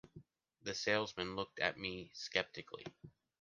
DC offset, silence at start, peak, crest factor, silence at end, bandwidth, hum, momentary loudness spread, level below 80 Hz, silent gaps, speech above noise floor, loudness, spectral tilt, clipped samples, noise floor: under 0.1%; 0.15 s; -16 dBFS; 26 dB; 0.3 s; 10 kHz; none; 14 LU; -70 dBFS; none; 21 dB; -40 LUFS; -3 dB/octave; under 0.1%; -62 dBFS